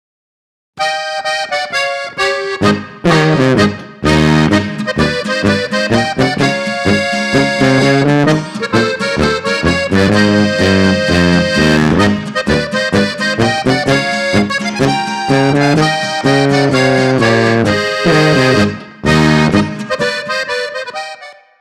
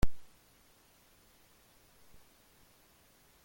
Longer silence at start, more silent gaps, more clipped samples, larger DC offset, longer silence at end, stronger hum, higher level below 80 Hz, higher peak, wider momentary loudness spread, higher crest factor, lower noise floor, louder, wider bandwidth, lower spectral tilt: first, 0.75 s vs 0 s; neither; neither; neither; first, 0.25 s vs 0 s; neither; first, -36 dBFS vs -46 dBFS; first, -2 dBFS vs -14 dBFS; first, 7 LU vs 0 LU; second, 12 dB vs 22 dB; second, -33 dBFS vs -65 dBFS; first, -12 LUFS vs -55 LUFS; second, 14 kHz vs 17 kHz; about the same, -5.5 dB/octave vs -6 dB/octave